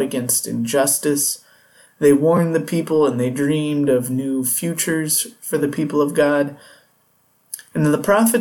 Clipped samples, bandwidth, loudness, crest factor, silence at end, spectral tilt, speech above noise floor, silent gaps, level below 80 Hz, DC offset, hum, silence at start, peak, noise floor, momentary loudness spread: under 0.1%; 19 kHz; -18 LUFS; 16 dB; 0 s; -4.5 dB/octave; 42 dB; none; -62 dBFS; under 0.1%; none; 0 s; -4 dBFS; -60 dBFS; 7 LU